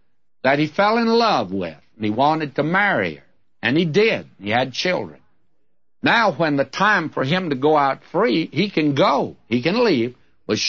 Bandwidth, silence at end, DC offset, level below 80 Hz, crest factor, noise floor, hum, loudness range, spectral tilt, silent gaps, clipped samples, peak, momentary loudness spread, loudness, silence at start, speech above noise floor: 7 kHz; 0 s; 0.2%; -64 dBFS; 16 dB; -75 dBFS; none; 2 LU; -5.5 dB/octave; none; under 0.1%; -4 dBFS; 9 LU; -19 LUFS; 0.45 s; 56 dB